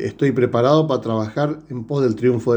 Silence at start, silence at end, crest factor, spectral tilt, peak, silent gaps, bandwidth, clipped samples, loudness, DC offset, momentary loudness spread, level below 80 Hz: 0 s; 0 s; 16 dB; -8 dB/octave; -2 dBFS; none; 9 kHz; under 0.1%; -19 LUFS; under 0.1%; 8 LU; -56 dBFS